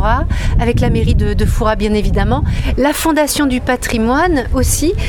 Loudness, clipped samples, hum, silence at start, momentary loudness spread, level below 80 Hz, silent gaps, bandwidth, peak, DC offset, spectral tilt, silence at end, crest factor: -14 LUFS; under 0.1%; none; 0 s; 3 LU; -18 dBFS; none; 19 kHz; 0 dBFS; under 0.1%; -5.5 dB/octave; 0 s; 12 dB